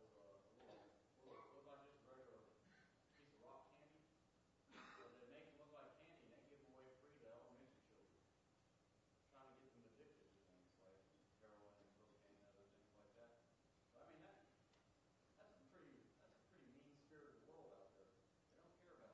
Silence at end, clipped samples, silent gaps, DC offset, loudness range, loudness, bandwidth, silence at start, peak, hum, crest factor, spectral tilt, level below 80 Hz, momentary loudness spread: 0 s; under 0.1%; none; under 0.1%; 2 LU; -67 LUFS; 7.4 kHz; 0 s; -50 dBFS; none; 20 dB; -4 dB/octave; under -90 dBFS; 5 LU